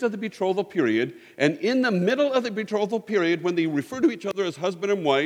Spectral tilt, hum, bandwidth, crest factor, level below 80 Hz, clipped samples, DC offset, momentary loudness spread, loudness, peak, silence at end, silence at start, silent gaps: -6 dB/octave; none; 13.5 kHz; 18 dB; -74 dBFS; under 0.1%; under 0.1%; 6 LU; -24 LUFS; -6 dBFS; 0 s; 0 s; none